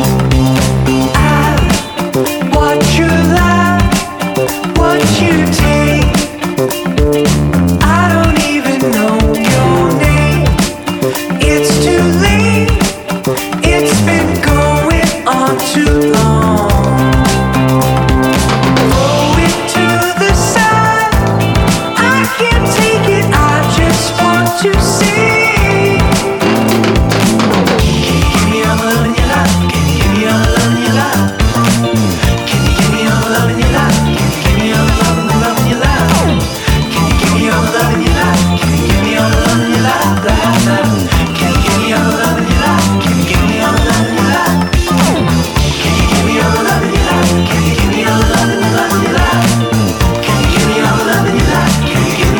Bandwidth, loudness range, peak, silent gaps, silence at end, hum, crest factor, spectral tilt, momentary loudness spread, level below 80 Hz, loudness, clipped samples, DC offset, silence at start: over 20 kHz; 1 LU; 0 dBFS; none; 0 s; none; 10 dB; -5 dB/octave; 3 LU; -20 dBFS; -10 LUFS; under 0.1%; under 0.1%; 0 s